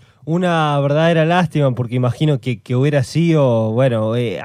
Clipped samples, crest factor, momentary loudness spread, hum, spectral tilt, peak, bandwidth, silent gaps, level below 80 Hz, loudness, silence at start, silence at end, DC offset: under 0.1%; 12 dB; 5 LU; none; -7.5 dB/octave; -4 dBFS; 11 kHz; none; -56 dBFS; -16 LUFS; 0.25 s; 0 s; under 0.1%